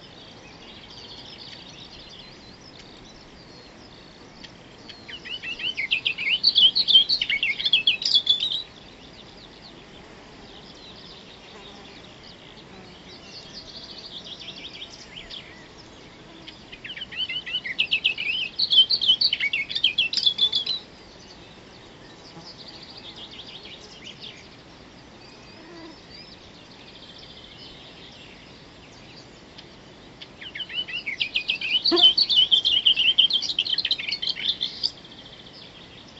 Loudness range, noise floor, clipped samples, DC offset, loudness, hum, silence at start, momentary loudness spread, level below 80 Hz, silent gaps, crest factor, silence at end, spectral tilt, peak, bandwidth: 25 LU; -47 dBFS; under 0.1%; under 0.1%; -20 LUFS; none; 0 s; 27 LU; -58 dBFS; none; 22 dB; 0 s; -1.5 dB/octave; -4 dBFS; 8.2 kHz